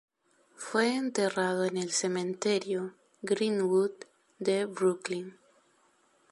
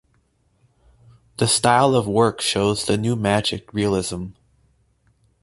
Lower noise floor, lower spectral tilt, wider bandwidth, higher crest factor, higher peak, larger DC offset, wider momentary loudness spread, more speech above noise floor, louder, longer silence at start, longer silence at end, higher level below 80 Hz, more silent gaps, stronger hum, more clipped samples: first, -68 dBFS vs -63 dBFS; about the same, -4 dB/octave vs -4.5 dB/octave; about the same, 11.5 kHz vs 12 kHz; about the same, 18 dB vs 20 dB; second, -14 dBFS vs -2 dBFS; neither; about the same, 11 LU vs 12 LU; second, 38 dB vs 44 dB; second, -30 LUFS vs -19 LUFS; second, 0.6 s vs 1.4 s; about the same, 1 s vs 1.1 s; second, -80 dBFS vs -48 dBFS; neither; neither; neither